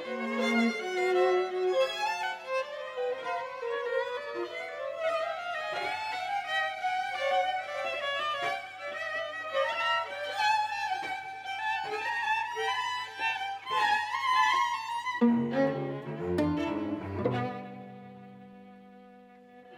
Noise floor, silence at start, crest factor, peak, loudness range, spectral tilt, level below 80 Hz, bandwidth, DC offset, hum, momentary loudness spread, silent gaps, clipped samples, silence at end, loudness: -54 dBFS; 0 s; 18 dB; -14 dBFS; 5 LU; -4.5 dB/octave; -70 dBFS; 16 kHz; under 0.1%; none; 10 LU; none; under 0.1%; 0 s; -31 LUFS